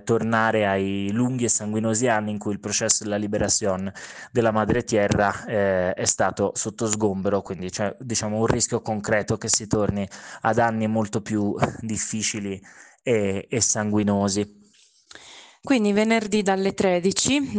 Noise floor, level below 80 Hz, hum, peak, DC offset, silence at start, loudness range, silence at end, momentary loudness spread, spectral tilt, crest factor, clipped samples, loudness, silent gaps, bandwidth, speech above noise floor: -57 dBFS; -52 dBFS; none; -6 dBFS; under 0.1%; 0.05 s; 2 LU; 0 s; 7 LU; -4 dB/octave; 16 dB; under 0.1%; -23 LUFS; none; 10.5 kHz; 34 dB